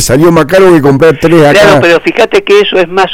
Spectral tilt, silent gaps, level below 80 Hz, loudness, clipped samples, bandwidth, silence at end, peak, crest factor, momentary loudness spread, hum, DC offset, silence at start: -5 dB/octave; none; -32 dBFS; -5 LUFS; 3%; 16.5 kHz; 0 s; 0 dBFS; 4 dB; 5 LU; none; under 0.1%; 0 s